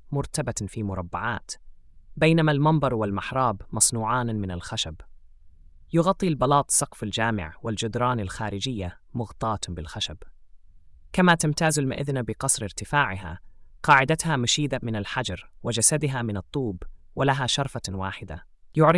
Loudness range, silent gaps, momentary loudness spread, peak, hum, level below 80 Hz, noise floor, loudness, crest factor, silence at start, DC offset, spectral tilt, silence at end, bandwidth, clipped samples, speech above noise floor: 4 LU; none; 13 LU; -4 dBFS; none; -48 dBFS; -49 dBFS; -25 LUFS; 20 dB; 0.05 s; under 0.1%; -4 dB/octave; 0 s; 12 kHz; under 0.1%; 24 dB